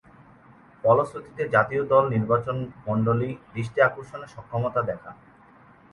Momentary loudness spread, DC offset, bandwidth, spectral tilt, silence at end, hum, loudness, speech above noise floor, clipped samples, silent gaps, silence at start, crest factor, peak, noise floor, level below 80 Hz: 14 LU; under 0.1%; 11 kHz; -8.5 dB/octave; 0.8 s; none; -24 LUFS; 29 dB; under 0.1%; none; 0.85 s; 20 dB; -4 dBFS; -53 dBFS; -56 dBFS